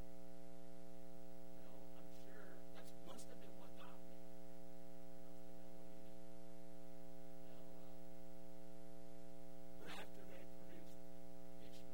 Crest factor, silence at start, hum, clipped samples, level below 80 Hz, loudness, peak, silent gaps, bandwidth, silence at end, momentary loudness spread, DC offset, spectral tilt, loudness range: 18 dB; 0 s; none; under 0.1%; -72 dBFS; -60 LUFS; -36 dBFS; none; 16 kHz; 0 s; 3 LU; 0.8%; -5.5 dB/octave; 2 LU